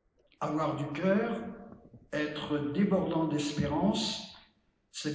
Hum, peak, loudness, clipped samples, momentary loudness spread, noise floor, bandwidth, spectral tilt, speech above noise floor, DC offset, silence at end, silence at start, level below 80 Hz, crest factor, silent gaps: none; -16 dBFS; -32 LUFS; under 0.1%; 14 LU; -68 dBFS; 8 kHz; -5.5 dB/octave; 38 dB; under 0.1%; 0 s; 0.4 s; -58 dBFS; 16 dB; none